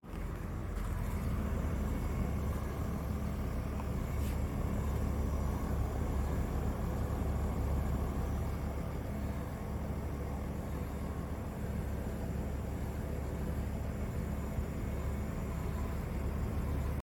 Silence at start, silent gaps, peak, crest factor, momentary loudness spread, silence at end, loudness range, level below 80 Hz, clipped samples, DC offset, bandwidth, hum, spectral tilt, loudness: 0.05 s; none; -22 dBFS; 14 dB; 4 LU; 0 s; 3 LU; -38 dBFS; under 0.1%; under 0.1%; 17 kHz; none; -7.5 dB/octave; -38 LUFS